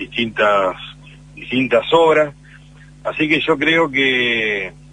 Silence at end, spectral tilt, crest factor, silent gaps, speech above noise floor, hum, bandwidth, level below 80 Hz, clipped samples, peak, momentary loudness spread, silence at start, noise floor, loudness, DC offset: 0.2 s; -5 dB/octave; 18 dB; none; 26 dB; 50 Hz at -45 dBFS; 9.8 kHz; -48 dBFS; under 0.1%; 0 dBFS; 13 LU; 0 s; -42 dBFS; -16 LUFS; under 0.1%